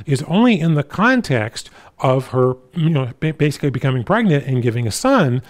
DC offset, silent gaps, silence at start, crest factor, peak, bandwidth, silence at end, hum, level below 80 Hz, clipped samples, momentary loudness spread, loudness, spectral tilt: under 0.1%; none; 0 s; 14 dB; -2 dBFS; 15.5 kHz; 0.05 s; none; -50 dBFS; under 0.1%; 6 LU; -17 LUFS; -6.5 dB/octave